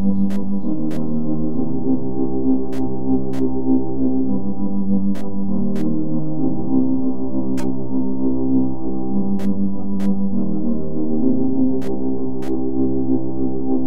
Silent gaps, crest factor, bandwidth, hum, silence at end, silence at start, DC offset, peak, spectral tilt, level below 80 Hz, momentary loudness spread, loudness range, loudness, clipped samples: none; 14 dB; 7.8 kHz; none; 0 s; 0 s; 20%; -4 dBFS; -10 dB/octave; -44 dBFS; 4 LU; 1 LU; -22 LUFS; under 0.1%